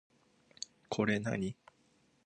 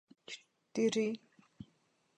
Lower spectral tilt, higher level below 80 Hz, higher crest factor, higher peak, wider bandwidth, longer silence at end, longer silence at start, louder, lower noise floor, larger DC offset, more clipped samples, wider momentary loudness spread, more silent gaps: about the same, -5.5 dB/octave vs -4.5 dB/octave; first, -68 dBFS vs -80 dBFS; about the same, 22 dB vs 18 dB; first, -18 dBFS vs -22 dBFS; about the same, 9.4 kHz vs 10 kHz; first, 0.75 s vs 0.55 s; first, 0.9 s vs 0.3 s; about the same, -37 LUFS vs -36 LUFS; second, -71 dBFS vs -75 dBFS; neither; neither; second, 15 LU vs 24 LU; neither